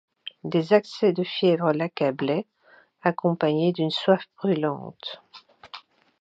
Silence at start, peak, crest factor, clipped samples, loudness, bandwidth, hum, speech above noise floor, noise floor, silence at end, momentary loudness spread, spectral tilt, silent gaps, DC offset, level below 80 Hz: 0.25 s; -4 dBFS; 20 dB; under 0.1%; -24 LUFS; 7.8 kHz; none; 34 dB; -57 dBFS; 0.4 s; 21 LU; -7.5 dB/octave; none; under 0.1%; -76 dBFS